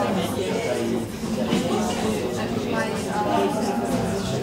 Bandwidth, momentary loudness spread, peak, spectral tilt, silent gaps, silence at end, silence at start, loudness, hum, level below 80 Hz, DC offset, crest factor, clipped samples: 16 kHz; 4 LU; -10 dBFS; -5 dB/octave; none; 0 s; 0 s; -24 LUFS; none; -46 dBFS; under 0.1%; 14 dB; under 0.1%